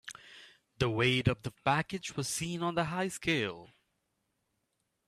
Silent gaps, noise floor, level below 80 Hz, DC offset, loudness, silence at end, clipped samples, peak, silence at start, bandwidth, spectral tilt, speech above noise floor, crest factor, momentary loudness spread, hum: none; -81 dBFS; -60 dBFS; under 0.1%; -32 LUFS; 1.4 s; under 0.1%; -12 dBFS; 0.05 s; 15 kHz; -4.5 dB/octave; 49 dB; 22 dB; 17 LU; none